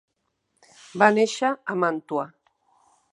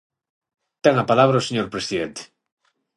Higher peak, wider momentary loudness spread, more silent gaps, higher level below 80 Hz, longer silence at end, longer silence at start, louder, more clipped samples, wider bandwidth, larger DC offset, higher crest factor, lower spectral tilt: about the same, -2 dBFS vs -2 dBFS; first, 15 LU vs 12 LU; neither; second, -78 dBFS vs -60 dBFS; about the same, 0.85 s vs 0.75 s; about the same, 0.95 s vs 0.85 s; second, -23 LUFS vs -20 LUFS; neither; about the same, 11 kHz vs 11.5 kHz; neither; about the same, 24 dB vs 22 dB; about the same, -4.5 dB/octave vs -5.5 dB/octave